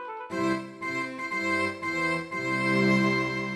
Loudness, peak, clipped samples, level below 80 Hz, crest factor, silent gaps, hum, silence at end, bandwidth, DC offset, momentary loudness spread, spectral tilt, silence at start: -27 LUFS; -12 dBFS; under 0.1%; -62 dBFS; 16 dB; none; none; 0 s; 13 kHz; under 0.1%; 9 LU; -5.5 dB/octave; 0 s